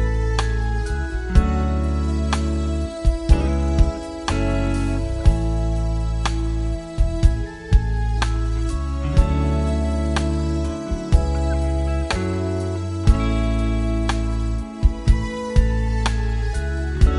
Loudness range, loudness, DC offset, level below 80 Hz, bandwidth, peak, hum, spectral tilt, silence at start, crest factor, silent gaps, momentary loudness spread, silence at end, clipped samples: 1 LU; -22 LUFS; under 0.1%; -20 dBFS; 11 kHz; -2 dBFS; none; -6.5 dB/octave; 0 s; 18 dB; none; 5 LU; 0 s; under 0.1%